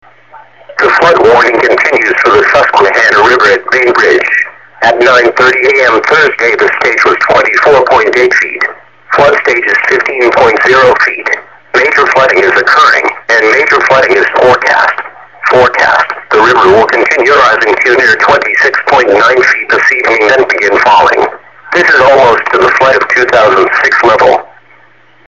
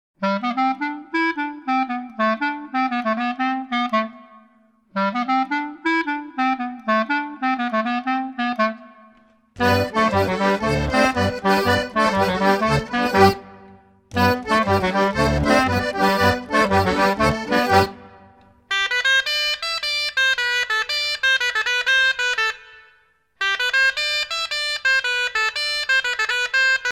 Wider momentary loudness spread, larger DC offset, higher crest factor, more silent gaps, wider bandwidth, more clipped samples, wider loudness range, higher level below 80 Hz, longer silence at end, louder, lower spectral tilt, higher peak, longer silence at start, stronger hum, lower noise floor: about the same, 5 LU vs 7 LU; first, 0.6% vs under 0.1%; second, 6 dB vs 20 dB; neither; second, 8.6 kHz vs 18 kHz; first, 0.4% vs under 0.1%; second, 1 LU vs 5 LU; about the same, -44 dBFS vs -42 dBFS; first, 0.8 s vs 0 s; first, -6 LUFS vs -20 LUFS; about the same, -3.5 dB/octave vs -4 dB/octave; about the same, 0 dBFS vs -2 dBFS; first, 0.35 s vs 0.2 s; neither; second, -43 dBFS vs -59 dBFS